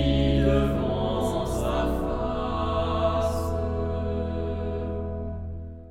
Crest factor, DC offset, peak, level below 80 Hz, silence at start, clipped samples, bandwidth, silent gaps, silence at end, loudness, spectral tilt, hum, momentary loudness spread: 16 dB; under 0.1%; -8 dBFS; -32 dBFS; 0 s; under 0.1%; 15.5 kHz; none; 0 s; -27 LUFS; -7 dB/octave; none; 10 LU